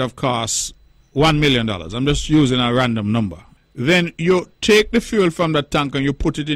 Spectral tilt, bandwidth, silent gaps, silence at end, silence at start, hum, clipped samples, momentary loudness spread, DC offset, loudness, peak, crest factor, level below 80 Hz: -4.5 dB/octave; 15.5 kHz; none; 0 s; 0 s; none; under 0.1%; 7 LU; under 0.1%; -18 LUFS; -4 dBFS; 14 dB; -34 dBFS